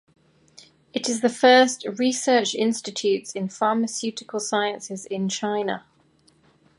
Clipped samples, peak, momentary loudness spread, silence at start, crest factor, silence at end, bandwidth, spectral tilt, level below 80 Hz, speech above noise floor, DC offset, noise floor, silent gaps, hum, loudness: under 0.1%; -4 dBFS; 13 LU; 0.95 s; 20 dB; 1 s; 11.5 kHz; -3 dB/octave; -74 dBFS; 38 dB; under 0.1%; -60 dBFS; none; none; -23 LUFS